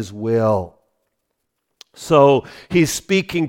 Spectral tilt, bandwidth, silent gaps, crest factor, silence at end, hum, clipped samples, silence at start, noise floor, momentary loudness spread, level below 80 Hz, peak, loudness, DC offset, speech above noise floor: -5.5 dB/octave; 17 kHz; none; 18 dB; 0 s; none; under 0.1%; 0 s; -74 dBFS; 10 LU; -50 dBFS; 0 dBFS; -17 LUFS; under 0.1%; 57 dB